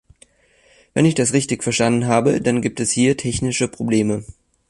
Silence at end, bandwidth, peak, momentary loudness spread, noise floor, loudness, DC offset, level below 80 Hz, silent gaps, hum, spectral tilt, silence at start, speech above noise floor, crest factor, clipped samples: 0.4 s; 11.5 kHz; -2 dBFS; 5 LU; -56 dBFS; -19 LUFS; under 0.1%; -46 dBFS; none; none; -5 dB/octave; 0.95 s; 38 dB; 16 dB; under 0.1%